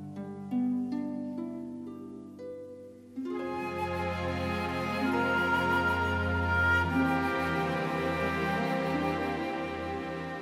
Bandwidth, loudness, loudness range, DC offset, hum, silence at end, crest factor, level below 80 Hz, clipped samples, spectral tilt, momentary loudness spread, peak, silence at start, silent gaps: 16 kHz; -31 LUFS; 9 LU; under 0.1%; none; 0 s; 16 dB; -52 dBFS; under 0.1%; -6.5 dB/octave; 16 LU; -16 dBFS; 0 s; none